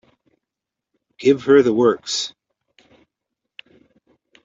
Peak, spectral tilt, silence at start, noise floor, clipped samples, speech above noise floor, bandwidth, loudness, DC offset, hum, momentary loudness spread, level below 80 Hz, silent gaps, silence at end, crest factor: -2 dBFS; -4.5 dB/octave; 1.2 s; -85 dBFS; under 0.1%; 69 dB; 8 kHz; -17 LUFS; under 0.1%; none; 10 LU; -64 dBFS; none; 2.15 s; 20 dB